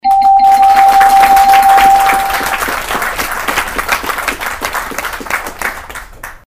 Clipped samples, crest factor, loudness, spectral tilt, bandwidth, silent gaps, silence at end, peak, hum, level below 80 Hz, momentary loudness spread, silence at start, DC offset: 0.2%; 10 dB; -10 LUFS; -1.5 dB/octave; 16.5 kHz; none; 0.1 s; 0 dBFS; none; -34 dBFS; 14 LU; 0.05 s; under 0.1%